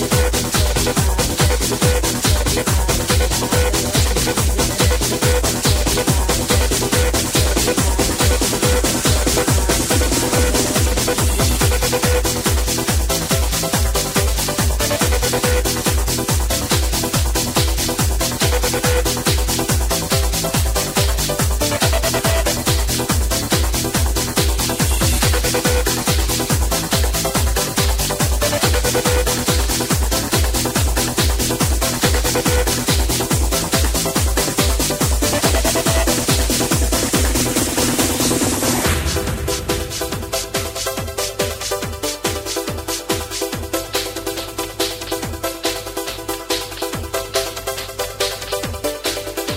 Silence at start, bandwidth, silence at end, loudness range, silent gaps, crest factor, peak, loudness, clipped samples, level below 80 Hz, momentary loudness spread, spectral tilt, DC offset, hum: 0 s; 16.5 kHz; 0 s; 6 LU; none; 16 dB; -2 dBFS; -17 LUFS; under 0.1%; -22 dBFS; 6 LU; -3.5 dB/octave; under 0.1%; none